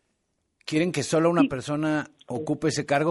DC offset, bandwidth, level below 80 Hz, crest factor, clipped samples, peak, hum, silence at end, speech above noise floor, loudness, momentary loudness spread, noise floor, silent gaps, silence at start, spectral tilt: under 0.1%; 11.5 kHz; -62 dBFS; 20 dB; under 0.1%; -6 dBFS; none; 0 s; 51 dB; -25 LUFS; 10 LU; -75 dBFS; none; 0.65 s; -5.5 dB/octave